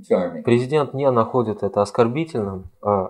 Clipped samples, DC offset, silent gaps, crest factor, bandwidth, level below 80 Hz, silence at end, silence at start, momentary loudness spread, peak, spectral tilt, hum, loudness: under 0.1%; under 0.1%; none; 18 dB; 11 kHz; -54 dBFS; 0 s; 0 s; 7 LU; -2 dBFS; -7.5 dB/octave; none; -21 LUFS